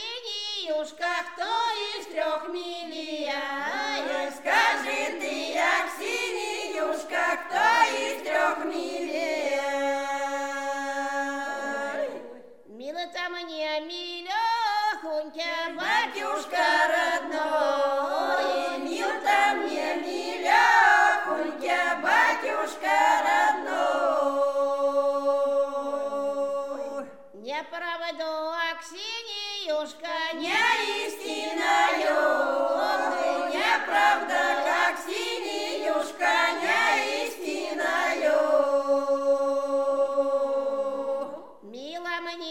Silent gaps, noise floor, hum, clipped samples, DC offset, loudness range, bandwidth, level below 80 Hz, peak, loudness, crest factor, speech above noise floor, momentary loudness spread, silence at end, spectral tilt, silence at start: none; -46 dBFS; none; under 0.1%; 0.2%; 8 LU; 16.5 kHz; -78 dBFS; -8 dBFS; -26 LUFS; 18 dB; 17 dB; 10 LU; 0 s; -0.5 dB/octave; 0 s